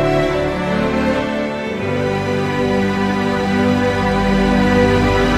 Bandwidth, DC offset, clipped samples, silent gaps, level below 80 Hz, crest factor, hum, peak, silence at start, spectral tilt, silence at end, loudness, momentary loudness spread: 15 kHz; under 0.1%; under 0.1%; none; -30 dBFS; 14 dB; none; -2 dBFS; 0 s; -6.5 dB/octave; 0 s; -17 LUFS; 6 LU